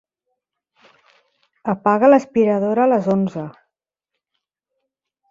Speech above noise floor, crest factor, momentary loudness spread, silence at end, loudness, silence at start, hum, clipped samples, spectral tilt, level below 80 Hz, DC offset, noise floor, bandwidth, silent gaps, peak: 65 dB; 20 dB; 16 LU; 1.8 s; -17 LUFS; 1.65 s; none; under 0.1%; -8.5 dB/octave; -64 dBFS; under 0.1%; -81 dBFS; 7.6 kHz; none; -2 dBFS